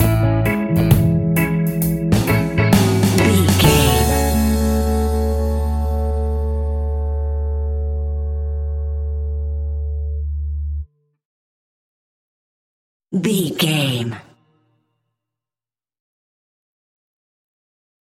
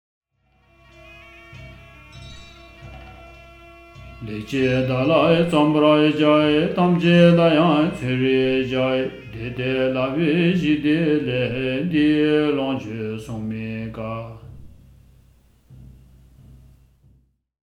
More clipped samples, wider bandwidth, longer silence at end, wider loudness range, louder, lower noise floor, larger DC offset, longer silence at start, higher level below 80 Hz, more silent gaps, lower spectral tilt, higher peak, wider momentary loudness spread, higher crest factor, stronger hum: neither; first, 17 kHz vs 10.5 kHz; first, 4 s vs 1.9 s; second, 12 LU vs 16 LU; about the same, -18 LUFS vs -19 LUFS; first, under -90 dBFS vs -61 dBFS; neither; second, 0 s vs 1.1 s; first, -24 dBFS vs -48 dBFS; first, 11.25-13.00 s vs none; second, -5.5 dB/octave vs -7.5 dB/octave; about the same, 0 dBFS vs -2 dBFS; second, 11 LU vs 20 LU; about the same, 18 dB vs 18 dB; neither